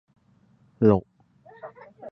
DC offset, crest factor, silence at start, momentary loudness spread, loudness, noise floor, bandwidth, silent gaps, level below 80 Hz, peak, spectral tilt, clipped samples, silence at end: under 0.1%; 22 dB; 0.8 s; 24 LU; -22 LUFS; -61 dBFS; 5.6 kHz; none; -54 dBFS; -6 dBFS; -11.5 dB/octave; under 0.1%; 0 s